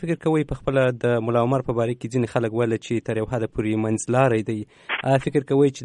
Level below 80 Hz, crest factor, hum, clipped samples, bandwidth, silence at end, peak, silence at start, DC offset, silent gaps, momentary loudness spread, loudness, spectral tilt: -48 dBFS; 16 dB; none; under 0.1%; 10.5 kHz; 0 s; -6 dBFS; 0 s; under 0.1%; none; 6 LU; -23 LUFS; -6.5 dB/octave